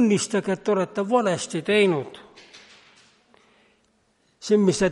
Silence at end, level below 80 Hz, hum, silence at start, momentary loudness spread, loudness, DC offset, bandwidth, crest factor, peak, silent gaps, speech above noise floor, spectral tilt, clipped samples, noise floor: 0 s; -60 dBFS; none; 0 s; 13 LU; -22 LUFS; under 0.1%; 11.5 kHz; 18 dB; -6 dBFS; none; 44 dB; -5 dB/octave; under 0.1%; -66 dBFS